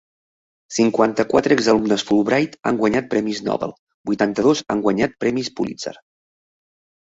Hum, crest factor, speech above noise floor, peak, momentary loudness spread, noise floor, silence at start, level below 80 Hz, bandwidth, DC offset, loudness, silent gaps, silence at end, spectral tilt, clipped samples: none; 18 dB; over 71 dB; -2 dBFS; 10 LU; under -90 dBFS; 0.7 s; -54 dBFS; 8 kHz; under 0.1%; -19 LUFS; 3.79-3.87 s, 3.94-4.04 s; 1.1 s; -5 dB/octave; under 0.1%